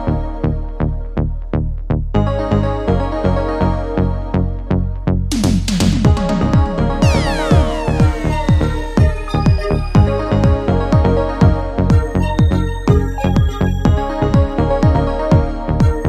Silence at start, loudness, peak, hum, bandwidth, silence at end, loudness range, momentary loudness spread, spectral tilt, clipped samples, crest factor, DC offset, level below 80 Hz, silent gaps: 0 s; -16 LUFS; 0 dBFS; none; 12.5 kHz; 0 s; 3 LU; 6 LU; -7.5 dB/octave; under 0.1%; 14 dB; under 0.1%; -20 dBFS; none